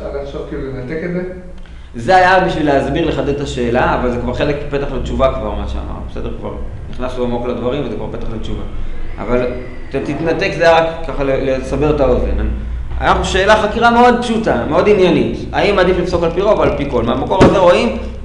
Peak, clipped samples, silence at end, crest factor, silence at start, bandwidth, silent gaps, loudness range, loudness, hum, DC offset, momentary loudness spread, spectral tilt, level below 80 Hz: 0 dBFS; under 0.1%; 0 s; 14 dB; 0 s; 11 kHz; none; 9 LU; -15 LUFS; none; 0.1%; 15 LU; -6 dB/octave; -24 dBFS